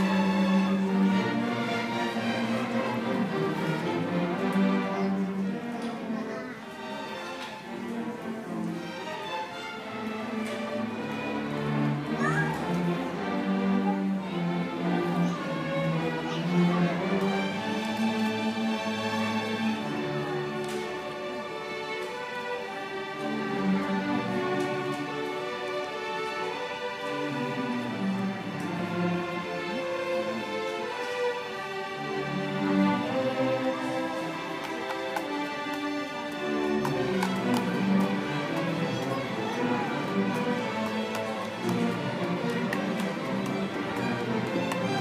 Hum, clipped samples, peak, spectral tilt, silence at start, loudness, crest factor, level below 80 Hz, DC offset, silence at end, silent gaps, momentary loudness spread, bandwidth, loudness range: none; under 0.1%; -14 dBFS; -6 dB/octave; 0 s; -30 LUFS; 16 dB; -66 dBFS; under 0.1%; 0 s; none; 8 LU; 15.5 kHz; 5 LU